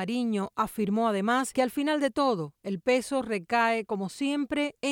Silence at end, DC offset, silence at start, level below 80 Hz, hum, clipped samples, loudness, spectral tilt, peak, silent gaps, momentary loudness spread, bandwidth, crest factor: 0 s; under 0.1%; 0 s; -64 dBFS; none; under 0.1%; -28 LUFS; -5 dB/octave; -12 dBFS; none; 5 LU; 17.5 kHz; 16 dB